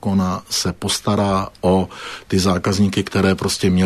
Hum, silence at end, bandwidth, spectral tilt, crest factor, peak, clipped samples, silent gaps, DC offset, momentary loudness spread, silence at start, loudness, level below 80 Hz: none; 0 s; 13.5 kHz; -5 dB/octave; 14 dB; -4 dBFS; under 0.1%; none; under 0.1%; 3 LU; 0.05 s; -19 LUFS; -44 dBFS